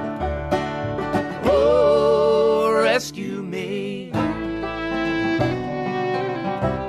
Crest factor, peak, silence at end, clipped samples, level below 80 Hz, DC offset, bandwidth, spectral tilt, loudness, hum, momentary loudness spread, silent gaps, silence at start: 14 dB; -6 dBFS; 0 s; under 0.1%; -40 dBFS; under 0.1%; 13.5 kHz; -6 dB/octave; -21 LUFS; none; 10 LU; none; 0 s